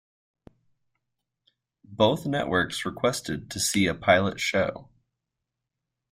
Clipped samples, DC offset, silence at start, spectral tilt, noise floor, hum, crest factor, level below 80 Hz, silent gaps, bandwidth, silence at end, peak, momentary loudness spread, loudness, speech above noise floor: under 0.1%; under 0.1%; 1.9 s; -4 dB/octave; -85 dBFS; none; 22 dB; -58 dBFS; none; 16 kHz; 1.3 s; -6 dBFS; 10 LU; -25 LUFS; 60 dB